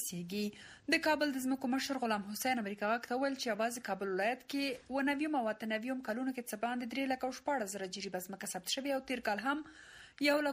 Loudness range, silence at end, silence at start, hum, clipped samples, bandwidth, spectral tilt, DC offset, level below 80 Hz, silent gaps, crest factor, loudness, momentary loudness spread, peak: 3 LU; 0 s; 0 s; none; under 0.1%; 15.5 kHz; -3.5 dB/octave; under 0.1%; -74 dBFS; none; 20 dB; -36 LUFS; 8 LU; -18 dBFS